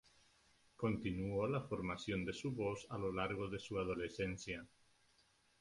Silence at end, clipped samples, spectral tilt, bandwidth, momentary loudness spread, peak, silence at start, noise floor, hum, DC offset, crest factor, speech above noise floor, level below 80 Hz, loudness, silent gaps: 0.95 s; under 0.1%; -6 dB/octave; 11.5 kHz; 4 LU; -24 dBFS; 0.8 s; -74 dBFS; none; under 0.1%; 18 dB; 33 dB; -62 dBFS; -42 LUFS; none